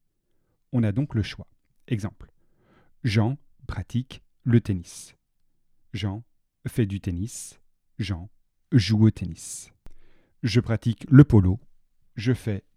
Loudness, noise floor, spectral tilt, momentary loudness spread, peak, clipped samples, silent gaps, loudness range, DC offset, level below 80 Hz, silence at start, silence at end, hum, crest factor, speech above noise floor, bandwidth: -24 LUFS; -69 dBFS; -7 dB/octave; 19 LU; 0 dBFS; under 0.1%; none; 10 LU; under 0.1%; -48 dBFS; 0.75 s; 0.15 s; none; 26 dB; 46 dB; 13 kHz